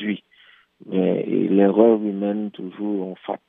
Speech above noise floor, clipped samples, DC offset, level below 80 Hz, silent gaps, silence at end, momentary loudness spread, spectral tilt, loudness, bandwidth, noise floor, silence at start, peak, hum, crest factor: 34 dB; under 0.1%; under 0.1%; -80 dBFS; none; 0.15 s; 14 LU; -11 dB/octave; -21 LUFS; 3.8 kHz; -54 dBFS; 0 s; -2 dBFS; none; 20 dB